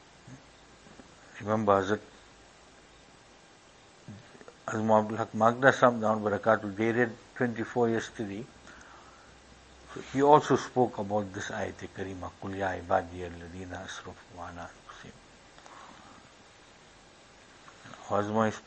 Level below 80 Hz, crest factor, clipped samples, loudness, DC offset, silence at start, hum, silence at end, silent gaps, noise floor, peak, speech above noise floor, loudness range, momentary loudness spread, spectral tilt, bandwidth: -64 dBFS; 28 dB; under 0.1%; -29 LUFS; under 0.1%; 0.25 s; none; 0.05 s; none; -56 dBFS; -4 dBFS; 28 dB; 17 LU; 27 LU; -6 dB/octave; 8.8 kHz